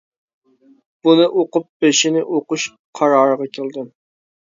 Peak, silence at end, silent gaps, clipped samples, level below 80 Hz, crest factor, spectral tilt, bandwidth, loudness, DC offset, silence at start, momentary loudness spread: 0 dBFS; 0.65 s; 1.69-1.80 s, 2.79-2.93 s; under 0.1%; -72 dBFS; 18 dB; -3.5 dB/octave; 7.8 kHz; -17 LUFS; under 0.1%; 1.05 s; 13 LU